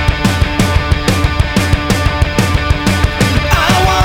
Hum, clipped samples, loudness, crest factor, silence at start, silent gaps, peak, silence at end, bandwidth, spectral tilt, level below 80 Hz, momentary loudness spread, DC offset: none; under 0.1%; -13 LUFS; 12 dB; 0 s; none; 0 dBFS; 0 s; 18 kHz; -5 dB/octave; -18 dBFS; 3 LU; under 0.1%